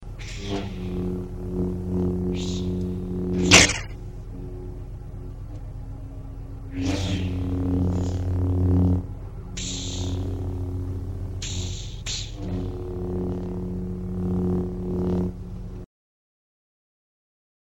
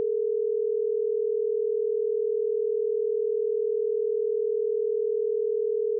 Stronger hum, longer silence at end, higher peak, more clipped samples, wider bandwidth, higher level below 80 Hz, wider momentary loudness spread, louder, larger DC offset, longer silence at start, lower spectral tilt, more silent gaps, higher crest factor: second, none vs 60 Hz at -120 dBFS; first, 1.85 s vs 0 s; first, 0 dBFS vs -20 dBFS; neither; first, 13.5 kHz vs 0.5 kHz; first, -36 dBFS vs under -90 dBFS; first, 16 LU vs 0 LU; about the same, -25 LUFS vs -27 LUFS; first, 0.2% vs under 0.1%; about the same, 0 s vs 0 s; first, -4 dB/octave vs 0.5 dB/octave; neither; first, 26 dB vs 6 dB